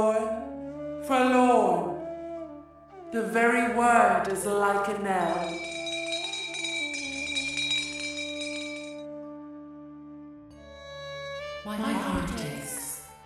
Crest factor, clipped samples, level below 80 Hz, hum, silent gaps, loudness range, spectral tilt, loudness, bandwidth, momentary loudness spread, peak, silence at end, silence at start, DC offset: 20 dB; under 0.1%; -54 dBFS; none; none; 12 LU; -3.5 dB/octave; -27 LUFS; 15 kHz; 22 LU; -8 dBFS; 0 s; 0 s; under 0.1%